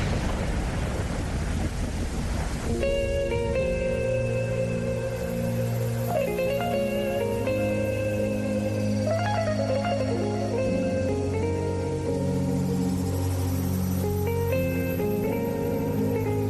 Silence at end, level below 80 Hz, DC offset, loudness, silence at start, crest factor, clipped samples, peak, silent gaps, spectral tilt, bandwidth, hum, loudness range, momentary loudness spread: 0 s; -36 dBFS; under 0.1%; -27 LUFS; 0 s; 12 dB; under 0.1%; -14 dBFS; none; -6.5 dB/octave; 13 kHz; none; 1 LU; 4 LU